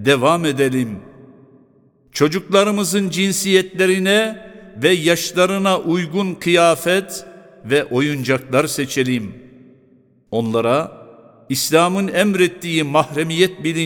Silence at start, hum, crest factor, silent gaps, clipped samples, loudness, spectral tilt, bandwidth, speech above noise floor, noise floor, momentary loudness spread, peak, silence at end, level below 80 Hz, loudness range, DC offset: 0 s; none; 18 dB; none; under 0.1%; -17 LUFS; -4.5 dB/octave; 19 kHz; 37 dB; -54 dBFS; 10 LU; 0 dBFS; 0 s; -58 dBFS; 4 LU; under 0.1%